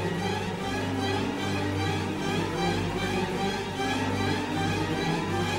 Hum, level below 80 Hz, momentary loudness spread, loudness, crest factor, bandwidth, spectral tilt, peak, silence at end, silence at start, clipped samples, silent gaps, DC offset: none; -48 dBFS; 2 LU; -28 LUFS; 14 dB; 16 kHz; -5 dB/octave; -14 dBFS; 0 s; 0 s; under 0.1%; none; under 0.1%